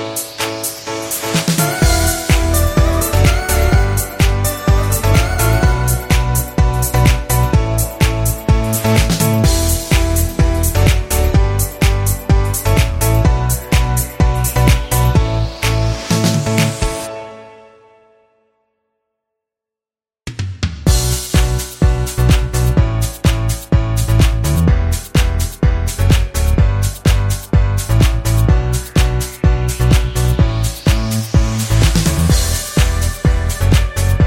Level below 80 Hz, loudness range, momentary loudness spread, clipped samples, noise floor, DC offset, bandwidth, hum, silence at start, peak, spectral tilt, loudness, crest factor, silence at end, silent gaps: -18 dBFS; 5 LU; 4 LU; under 0.1%; under -90 dBFS; under 0.1%; 16.5 kHz; none; 0 s; 0 dBFS; -5 dB/octave; -15 LUFS; 14 dB; 0 s; none